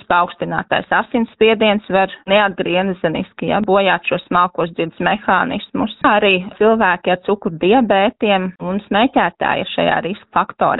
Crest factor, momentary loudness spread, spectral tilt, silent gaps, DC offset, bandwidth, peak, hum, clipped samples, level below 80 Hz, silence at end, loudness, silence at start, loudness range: 16 dB; 7 LU; -3 dB/octave; none; under 0.1%; 4.1 kHz; 0 dBFS; none; under 0.1%; -50 dBFS; 0 s; -16 LUFS; 0.1 s; 2 LU